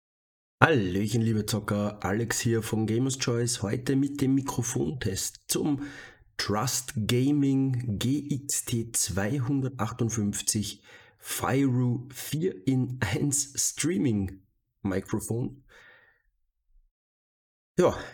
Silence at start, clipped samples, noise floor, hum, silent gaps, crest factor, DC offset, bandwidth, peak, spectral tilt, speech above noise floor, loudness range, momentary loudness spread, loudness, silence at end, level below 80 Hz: 0.6 s; under 0.1%; -73 dBFS; none; 16.91-17.75 s; 28 dB; under 0.1%; 19 kHz; -2 dBFS; -4.5 dB/octave; 46 dB; 4 LU; 8 LU; -28 LUFS; 0 s; -56 dBFS